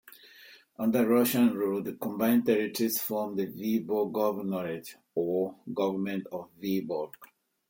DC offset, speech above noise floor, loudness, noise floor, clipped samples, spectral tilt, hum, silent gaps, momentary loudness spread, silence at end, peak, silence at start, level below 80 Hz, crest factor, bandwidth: under 0.1%; 26 dB; -29 LUFS; -55 dBFS; under 0.1%; -5.5 dB/octave; none; none; 12 LU; 0.45 s; -12 dBFS; 0.05 s; -74 dBFS; 16 dB; 17 kHz